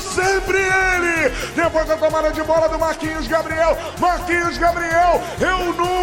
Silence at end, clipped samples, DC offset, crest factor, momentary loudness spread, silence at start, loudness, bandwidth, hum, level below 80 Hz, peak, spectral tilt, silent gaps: 0 s; under 0.1%; under 0.1%; 14 dB; 5 LU; 0 s; -18 LUFS; 17 kHz; none; -34 dBFS; -4 dBFS; -4 dB/octave; none